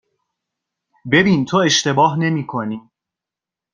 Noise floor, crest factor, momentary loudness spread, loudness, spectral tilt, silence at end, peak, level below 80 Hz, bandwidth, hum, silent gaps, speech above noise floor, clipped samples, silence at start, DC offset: -87 dBFS; 18 dB; 14 LU; -16 LUFS; -4.5 dB/octave; 0.95 s; -2 dBFS; -56 dBFS; 10 kHz; none; none; 71 dB; under 0.1%; 1.05 s; under 0.1%